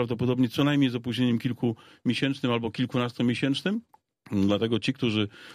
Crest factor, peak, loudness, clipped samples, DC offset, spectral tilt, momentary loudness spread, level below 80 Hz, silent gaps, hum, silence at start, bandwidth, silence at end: 16 dB; -12 dBFS; -27 LUFS; under 0.1%; under 0.1%; -6.5 dB/octave; 6 LU; -64 dBFS; none; none; 0 s; 15 kHz; 0 s